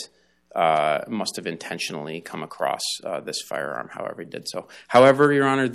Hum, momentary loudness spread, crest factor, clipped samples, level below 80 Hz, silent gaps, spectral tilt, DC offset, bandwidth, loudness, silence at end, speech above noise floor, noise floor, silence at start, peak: none; 17 LU; 18 dB; under 0.1%; -70 dBFS; none; -4.5 dB/octave; under 0.1%; 14 kHz; -23 LUFS; 0 s; 30 dB; -53 dBFS; 0 s; -4 dBFS